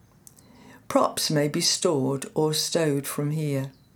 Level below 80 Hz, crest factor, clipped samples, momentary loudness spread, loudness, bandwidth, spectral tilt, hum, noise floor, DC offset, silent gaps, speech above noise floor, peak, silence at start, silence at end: -66 dBFS; 20 dB; under 0.1%; 6 LU; -25 LUFS; over 20 kHz; -4 dB/octave; none; -53 dBFS; under 0.1%; none; 29 dB; -6 dBFS; 0.65 s; 0.25 s